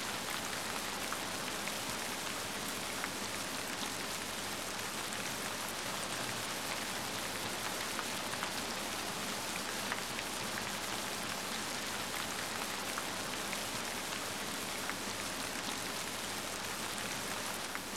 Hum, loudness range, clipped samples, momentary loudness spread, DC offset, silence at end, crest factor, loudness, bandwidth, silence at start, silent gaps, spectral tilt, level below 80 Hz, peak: none; 1 LU; under 0.1%; 1 LU; 0.1%; 0 s; 18 dB; -37 LUFS; 16.5 kHz; 0 s; none; -1.5 dB/octave; -64 dBFS; -20 dBFS